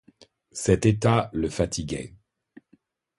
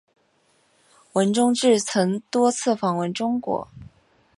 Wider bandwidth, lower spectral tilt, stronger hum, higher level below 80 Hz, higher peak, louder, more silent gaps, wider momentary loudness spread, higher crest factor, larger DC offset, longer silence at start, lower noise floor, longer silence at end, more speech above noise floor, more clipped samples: about the same, 11.5 kHz vs 11.5 kHz; first, -6 dB/octave vs -4.5 dB/octave; neither; first, -44 dBFS vs -62 dBFS; about the same, -6 dBFS vs -6 dBFS; second, -25 LUFS vs -22 LUFS; neither; first, 15 LU vs 9 LU; about the same, 20 dB vs 18 dB; neither; second, 0.55 s vs 1.15 s; about the same, -64 dBFS vs -64 dBFS; first, 1.1 s vs 0.55 s; about the same, 40 dB vs 43 dB; neither